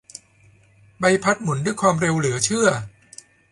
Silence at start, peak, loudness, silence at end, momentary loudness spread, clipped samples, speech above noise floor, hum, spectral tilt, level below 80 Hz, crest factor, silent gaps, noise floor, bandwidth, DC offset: 1 s; -4 dBFS; -20 LUFS; 0.6 s; 17 LU; under 0.1%; 35 dB; none; -4.5 dB/octave; -56 dBFS; 18 dB; none; -55 dBFS; 11.5 kHz; under 0.1%